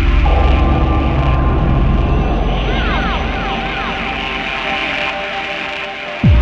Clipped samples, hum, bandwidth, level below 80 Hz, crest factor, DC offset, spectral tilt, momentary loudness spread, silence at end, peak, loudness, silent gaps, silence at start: under 0.1%; none; 7 kHz; -16 dBFS; 14 dB; under 0.1%; -7 dB/octave; 6 LU; 0 s; 0 dBFS; -16 LUFS; none; 0 s